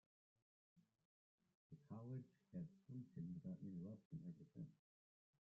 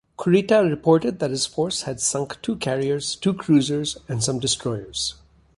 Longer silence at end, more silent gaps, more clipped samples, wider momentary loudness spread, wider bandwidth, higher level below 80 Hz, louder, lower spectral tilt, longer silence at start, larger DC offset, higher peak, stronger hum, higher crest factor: first, 0.7 s vs 0.45 s; first, 1.05-1.38 s, 1.55-1.70 s, 4.05-4.11 s vs none; neither; about the same, 6 LU vs 8 LU; second, 6.2 kHz vs 11.5 kHz; second, -86 dBFS vs -54 dBFS; second, -57 LUFS vs -22 LUFS; first, -11.5 dB/octave vs -4.5 dB/octave; first, 0.75 s vs 0.2 s; neither; second, -44 dBFS vs -4 dBFS; neither; about the same, 14 dB vs 18 dB